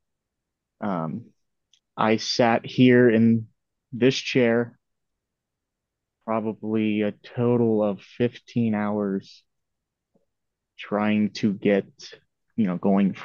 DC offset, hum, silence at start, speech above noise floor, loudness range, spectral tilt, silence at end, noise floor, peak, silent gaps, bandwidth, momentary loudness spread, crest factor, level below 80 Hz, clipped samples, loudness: under 0.1%; none; 0.8 s; 61 dB; 7 LU; -6.5 dB/octave; 0 s; -83 dBFS; -4 dBFS; none; 7.2 kHz; 15 LU; 20 dB; -70 dBFS; under 0.1%; -23 LUFS